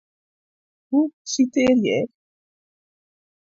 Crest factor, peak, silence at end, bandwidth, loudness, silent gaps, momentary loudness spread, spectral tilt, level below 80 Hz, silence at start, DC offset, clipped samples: 16 dB; -8 dBFS; 1.35 s; 7.8 kHz; -21 LUFS; 1.13-1.25 s; 7 LU; -4.5 dB/octave; -62 dBFS; 0.9 s; under 0.1%; under 0.1%